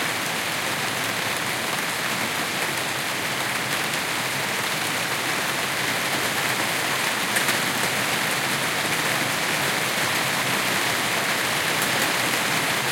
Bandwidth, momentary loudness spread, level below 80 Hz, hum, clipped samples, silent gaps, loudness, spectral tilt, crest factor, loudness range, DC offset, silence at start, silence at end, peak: 17 kHz; 3 LU; -64 dBFS; none; under 0.1%; none; -22 LUFS; -1.5 dB/octave; 18 dB; 2 LU; under 0.1%; 0 s; 0 s; -6 dBFS